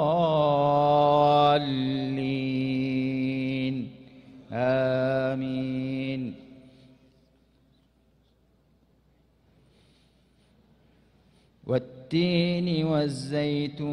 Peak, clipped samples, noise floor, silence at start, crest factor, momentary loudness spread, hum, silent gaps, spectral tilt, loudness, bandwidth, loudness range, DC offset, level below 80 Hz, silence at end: -10 dBFS; under 0.1%; -64 dBFS; 0 s; 18 dB; 10 LU; none; none; -7.5 dB/octave; -26 LUFS; 10.5 kHz; 14 LU; under 0.1%; -62 dBFS; 0 s